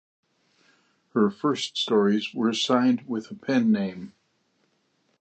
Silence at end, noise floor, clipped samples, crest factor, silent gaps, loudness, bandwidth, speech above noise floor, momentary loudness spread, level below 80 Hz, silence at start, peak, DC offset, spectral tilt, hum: 1.1 s; -70 dBFS; under 0.1%; 18 dB; none; -24 LUFS; 8.8 kHz; 46 dB; 11 LU; -72 dBFS; 1.15 s; -8 dBFS; under 0.1%; -5 dB/octave; none